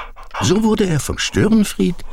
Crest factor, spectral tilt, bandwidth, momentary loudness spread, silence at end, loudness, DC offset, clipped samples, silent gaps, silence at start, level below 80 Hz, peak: 12 dB; -5 dB/octave; 16 kHz; 6 LU; 0 s; -17 LUFS; under 0.1%; under 0.1%; none; 0 s; -32 dBFS; -4 dBFS